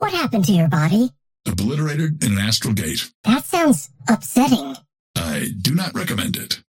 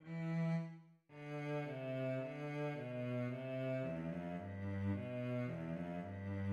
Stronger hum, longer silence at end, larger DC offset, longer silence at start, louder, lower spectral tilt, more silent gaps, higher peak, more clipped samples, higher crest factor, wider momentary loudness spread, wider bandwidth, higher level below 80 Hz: neither; first, 0.15 s vs 0 s; neither; about the same, 0 s vs 0 s; first, -19 LUFS vs -43 LUFS; second, -5 dB/octave vs -9 dB/octave; first, 3.15-3.24 s, 4.99-5.14 s vs none; first, -2 dBFS vs -30 dBFS; neither; about the same, 16 dB vs 12 dB; about the same, 7 LU vs 6 LU; first, 17 kHz vs 7.4 kHz; first, -48 dBFS vs -76 dBFS